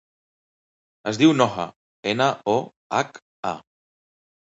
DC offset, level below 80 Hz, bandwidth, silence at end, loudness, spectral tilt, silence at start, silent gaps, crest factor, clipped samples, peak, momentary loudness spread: under 0.1%; -64 dBFS; 8 kHz; 0.9 s; -23 LUFS; -5 dB/octave; 1.05 s; 1.76-2.03 s, 2.76-2.90 s, 3.22-3.43 s; 22 dB; under 0.1%; -2 dBFS; 14 LU